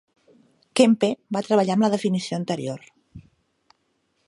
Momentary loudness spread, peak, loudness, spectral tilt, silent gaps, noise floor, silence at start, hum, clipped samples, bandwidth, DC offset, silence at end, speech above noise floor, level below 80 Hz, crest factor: 11 LU; -2 dBFS; -22 LUFS; -5.5 dB/octave; none; -70 dBFS; 0.75 s; none; under 0.1%; 11.5 kHz; under 0.1%; 1.05 s; 49 dB; -64 dBFS; 22 dB